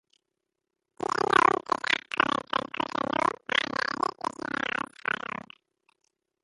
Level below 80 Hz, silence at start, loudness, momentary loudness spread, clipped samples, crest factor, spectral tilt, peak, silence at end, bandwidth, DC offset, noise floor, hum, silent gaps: -66 dBFS; 1.2 s; -28 LUFS; 10 LU; under 0.1%; 26 dB; -3 dB/octave; -4 dBFS; 1.75 s; 11.5 kHz; under 0.1%; -85 dBFS; none; none